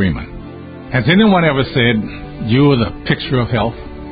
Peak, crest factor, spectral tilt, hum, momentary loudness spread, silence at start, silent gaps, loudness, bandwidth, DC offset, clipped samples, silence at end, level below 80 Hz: -2 dBFS; 14 dB; -12 dB/octave; none; 19 LU; 0 s; none; -14 LUFS; 5 kHz; under 0.1%; under 0.1%; 0 s; -34 dBFS